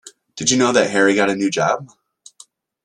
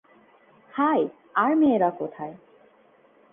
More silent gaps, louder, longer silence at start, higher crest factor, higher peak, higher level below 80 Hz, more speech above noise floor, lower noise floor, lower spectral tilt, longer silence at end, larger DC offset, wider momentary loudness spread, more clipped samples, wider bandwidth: neither; first, -17 LUFS vs -23 LUFS; second, 0.05 s vs 0.75 s; about the same, 18 dB vs 16 dB; first, -2 dBFS vs -10 dBFS; first, -60 dBFS vs -70 dBFS; about the same, 33 dB vs 35 dB; second, -49 dBFS vs -58 dBFS; second, -3 dB/octave vs -9.5 dB/octave; about the same, 1 s vs 0.95 s; neither; second, 8 LU vs 16 LU; neither; first, 11 kHz vs 3.7 kHz